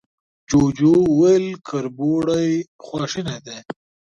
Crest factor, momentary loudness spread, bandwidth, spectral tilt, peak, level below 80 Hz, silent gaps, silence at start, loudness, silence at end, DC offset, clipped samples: 14 dB; 19 LU; 8.6 kHz; -6.5 dB/octave; -4 dBFS; -48 dBFS; 2.68-2.79 s; 0.5 s; -19 LUFS; 0.45 s; under 0.1%; under 0.1%